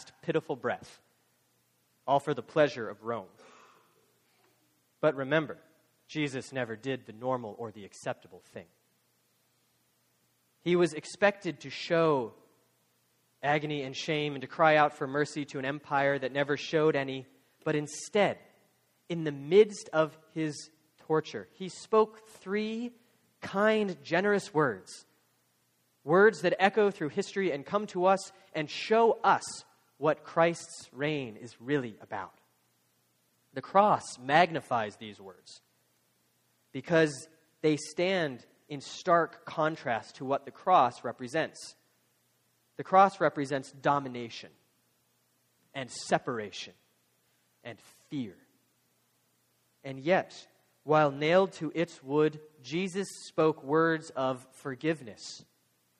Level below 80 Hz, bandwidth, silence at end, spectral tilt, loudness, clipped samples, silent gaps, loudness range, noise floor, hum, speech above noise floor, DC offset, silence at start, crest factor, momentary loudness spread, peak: -76 dBFS; 12.5 kHz; 0.6 s; -5 dB/octave; -30 LUFS; under 0.1%; none; 9 LU; -72 dBFS; none; 43 dB; under 0.1%; 0 s; 24 dB; 19 LU; -8 dBFS